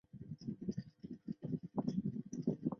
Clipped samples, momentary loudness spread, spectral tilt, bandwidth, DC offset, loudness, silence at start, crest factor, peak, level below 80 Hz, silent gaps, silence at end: under 0.1%; 11 LU; -10 dB/octave; 7 kHz; under 0.1%; -44 LUFS; 0.15 s; 18 dB; -24 dBFS; -70 dBFS; none; 0 s